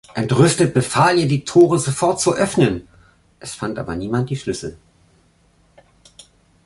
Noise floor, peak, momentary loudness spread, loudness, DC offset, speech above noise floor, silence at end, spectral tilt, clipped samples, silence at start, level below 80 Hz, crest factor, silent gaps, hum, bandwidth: -57 dBFS; -2 dBFS; 14 LU; -17 LUFS; under 0.1%; 40 dB; 1.9 s; -5.5 dB/octave; under 0.1%; 0.15 s; -48 dBFS; 18 dB; none; none; 11.5 kHz